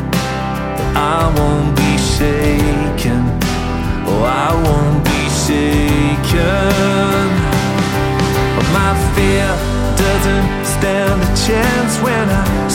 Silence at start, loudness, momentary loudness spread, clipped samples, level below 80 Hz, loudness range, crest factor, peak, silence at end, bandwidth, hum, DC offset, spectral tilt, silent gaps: 0 s; -14 LUFS; 4 LU; under 0.1%; -22 dBFS; 1 LU; 14 dB; 0 dBFS; 0 s; 17.5 kHz; none; under 0.1%; -5.5 dB/octave; none